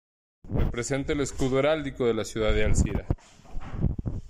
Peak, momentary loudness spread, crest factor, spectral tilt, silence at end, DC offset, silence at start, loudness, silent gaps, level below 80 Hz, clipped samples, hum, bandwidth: -10 dBFS; 9 LU; 16 dB; -5.5 dB/octave; 0 s; under 0.1%; 0.45 s; -28 LUFS; none; -32 dBFS; under 0.1%; none; 12.5 kHz